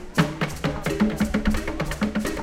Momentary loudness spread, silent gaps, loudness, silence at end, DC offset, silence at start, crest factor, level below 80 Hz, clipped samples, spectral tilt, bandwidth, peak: 4 LU; none; -25 LUFS; 0 s; under 0.1%; 0 s; 20 dB; -32 dBFS; under 0.1%; -5.5 dB/octave; 16.5 kHz; -4 dBFS